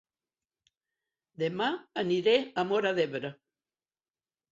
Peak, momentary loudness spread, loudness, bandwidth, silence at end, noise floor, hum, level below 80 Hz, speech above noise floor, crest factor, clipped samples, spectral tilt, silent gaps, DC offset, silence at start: -12 dBFS; 9 LU; -29 LUFS; 7.8 kHz; 1.2 s; under -90 dBFS; none; -76 dBFS; over 61 dB; 20 dB; under 0.1%; -5.5 dB/octave; none; under 0.1%; 1.4 s